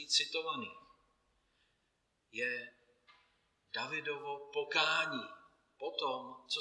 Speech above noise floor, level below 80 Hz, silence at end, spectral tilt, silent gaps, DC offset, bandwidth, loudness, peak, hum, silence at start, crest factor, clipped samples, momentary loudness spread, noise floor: 43 dB; -86 dBFS; 0 s; -1 dB/octave; none; under 0.1%; 12 kHz; -37 LUFS; -14 dBFS; none; 0 s; 26 dB; under 0.1%; 15 LU; -80 dBFS